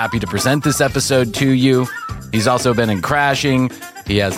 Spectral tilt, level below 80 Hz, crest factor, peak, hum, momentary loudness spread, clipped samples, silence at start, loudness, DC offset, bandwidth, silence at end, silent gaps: -5 dB/octave; -40 dBFS; 14 dB; -2 dBFS; none; 8 LU; under 0.1%; 0 s; -16 LUFS; under 0.1%; 16.5 kHz; 0 s; none